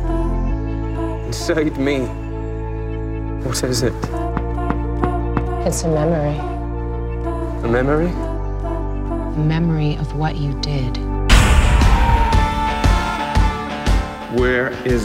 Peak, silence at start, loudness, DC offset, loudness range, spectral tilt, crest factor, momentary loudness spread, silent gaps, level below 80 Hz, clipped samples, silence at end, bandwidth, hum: 0 dBFS; 0 s; -20 LUFS; under 0.1%; 6 LU; -5.5 dB/octave; 18 dB; 10 LU; none; -22 dBFS; under 0.1%; 0 s; 15 kHz; none